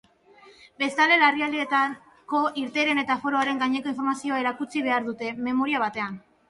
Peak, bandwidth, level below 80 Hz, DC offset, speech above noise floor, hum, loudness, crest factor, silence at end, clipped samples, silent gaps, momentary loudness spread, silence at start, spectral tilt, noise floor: -8 dBFS; 11.5 kHz; -70 dBFS; under 0.1%; 29 dB; none; -24 LUFS; 18 dB; 0.3 s; under 0.1%; none; 10 LU; 0.45 s; -3.5 dB/octave; -54 dBFS